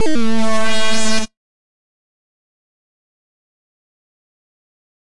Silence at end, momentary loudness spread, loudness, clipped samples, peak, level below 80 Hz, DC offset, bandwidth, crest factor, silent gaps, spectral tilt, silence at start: 3.75 s; 10 LU; -19 LUFS; under 0.1%; -6 dBFS; -40 dBFS; under 0.1%; 11.5 kHz; 14 dB; none; -3 dB/octave; 0 s